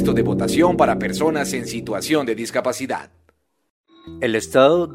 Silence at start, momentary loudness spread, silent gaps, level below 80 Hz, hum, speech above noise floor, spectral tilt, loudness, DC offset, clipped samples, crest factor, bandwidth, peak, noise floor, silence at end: 0 s; 11 LU; 3.70-3.84 s; -46 dBFS; none; 44 dB; -5 dB/octave; -20 LUFS; under 0.1%; under 0.1%; 18 dB; 16 kHz; 0 dBFS; -63 dBFS; 0 s